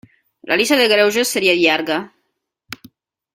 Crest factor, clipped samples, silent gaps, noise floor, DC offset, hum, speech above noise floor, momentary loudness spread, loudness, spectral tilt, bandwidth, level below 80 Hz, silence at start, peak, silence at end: 18 dB; under 0.1%; none; -73 dBFS; under 0.1%; none; 57 dB; 23 LU; -15 LUFS; -2.5 dB/octave; 16.5 kHz; -62 dBFS; 0.45 s; 0 dBFS; 0.6 s